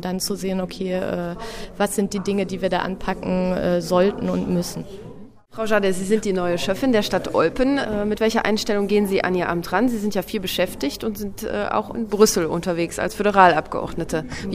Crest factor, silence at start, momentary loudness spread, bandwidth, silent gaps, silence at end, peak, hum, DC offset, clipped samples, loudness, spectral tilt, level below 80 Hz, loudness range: 22 dB; 0 s; 10 LU; 16 kHz; none; 0 s; 0 dBFS; none; under 0.1%; under 0.1%; -21 LUFS; -5 dB/octave; -42 dBFS; 3 LU